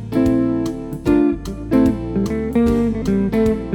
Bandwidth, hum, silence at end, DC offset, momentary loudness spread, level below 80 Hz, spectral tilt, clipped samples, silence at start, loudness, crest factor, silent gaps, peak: 17 kHz; none; 0 s; under 0.1%; 6 LU; -32 dBFS; -8 dB/octave; under 0.1%; 0 s; -18 LUFS; 14 dB; none; -4 dBFS